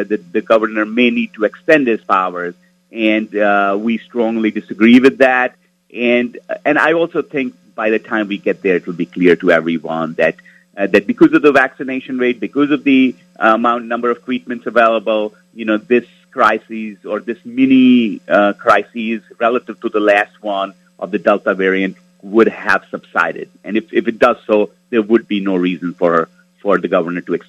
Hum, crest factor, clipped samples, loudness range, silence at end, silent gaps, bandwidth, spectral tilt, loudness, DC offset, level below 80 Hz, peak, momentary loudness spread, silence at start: none; 14 dB; under 0.1%; 3 LU; 0.1 s; none; 8.8 kHz; -6.5 dB/octave; -15 LUFS; under 0.1%; -62 dBFS; 0 dBFS; 11 LU; 0 s